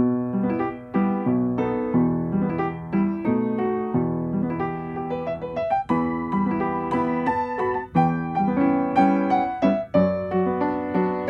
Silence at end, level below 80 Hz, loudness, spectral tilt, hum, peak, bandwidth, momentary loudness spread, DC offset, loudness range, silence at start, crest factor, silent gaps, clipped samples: 0 s; -52 dBFS; -23 LUFS; -10 dB/octave; none; -6 dBFS; 6 kHz; 6 LU; under 0.1%; 4 LU; 0 s; 16 dB; none; under 0.1%